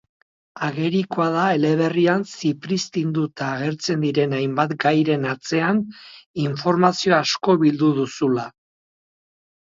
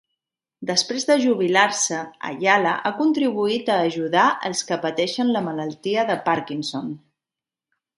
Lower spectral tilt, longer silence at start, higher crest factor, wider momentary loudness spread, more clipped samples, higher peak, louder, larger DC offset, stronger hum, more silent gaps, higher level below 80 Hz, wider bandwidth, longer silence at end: first, -6 dB/octave vs -3 dB/octave; about the same, 0.55 s vs 0.6 s; about the same, 20 dB vs 20 dB; about the same, 8 LU vs 10 LU; neither; about the same, 0 dBFS vs -2 dBFS; about the same, -21 LUFS vs -21 LUFS; neither; neither; first, 6.26-6.34 s vs none; first, -64 dBFS vs -72 dBFS; second, 7.8 kHz vs 11.5 kHz; first, 1.25 s vs 1 s